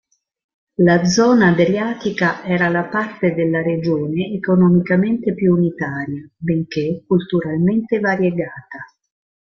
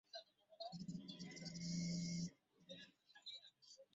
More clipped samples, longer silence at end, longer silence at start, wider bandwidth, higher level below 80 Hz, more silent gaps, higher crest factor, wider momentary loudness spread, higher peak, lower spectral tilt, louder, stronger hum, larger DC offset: neither; first, 0.6 s vs 0.1 s; first, 0.8 s vs 0.15 s; second, 7.2 kHz vs 8 kHz; first, -54 dBFS vs -78 dBFS; neither; about the same, 16 dB vs 16 dB; second, 12 LU vs 15 LU; first, -2 dBFS vs -36 dBFS; about the same, -6.5 dB/octave vs -5.5 dB/octave; first, -17 LUFS vs -50 LUFS; neither; neither